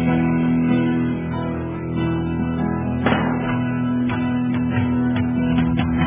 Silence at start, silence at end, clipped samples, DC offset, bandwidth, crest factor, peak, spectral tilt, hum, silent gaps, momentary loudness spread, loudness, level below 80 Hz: 0 s; 0 s; under 0.1%; under 0.1%; 3.8 kHz; 14 dB; -4 dBFS; -11.5 dB/octave; none; none; 5 LU; -21 LUFS; -36 dBFS